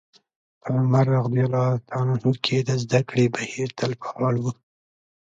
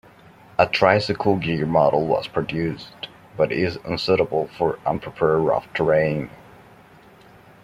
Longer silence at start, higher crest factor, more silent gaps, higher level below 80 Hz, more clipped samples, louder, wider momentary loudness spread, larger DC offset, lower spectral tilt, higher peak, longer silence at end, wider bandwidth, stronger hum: about the same, 0.65 s vs 0.6 s; about the same, 18 dB vs 20 dB; neither; second, -60 dBFS vs -52 dBFS; neither; about the same, -23 LUFS vs -21 LUFS; second, 8 LU vs 11 LU; neither; about the same, -6.5 dB/octave vs -7 dB/octave; second, -6 dBFS vs -2 dBFS; second, 0.7 s vs 1.35 s; second, 7.6 kHz vs 13.5 kHz; neither